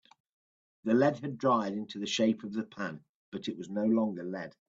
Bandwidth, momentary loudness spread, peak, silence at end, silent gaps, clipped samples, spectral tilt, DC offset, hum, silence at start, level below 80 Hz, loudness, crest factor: 7.6 kHz; 13 LU; -14 dBFS; 0.2 s; 3.09-3.32 s; under 0.1%; -5.5 dB/octave; under 0.1%; none; 0.85 s; -76 dBFS; -32 LUFS; 18 dB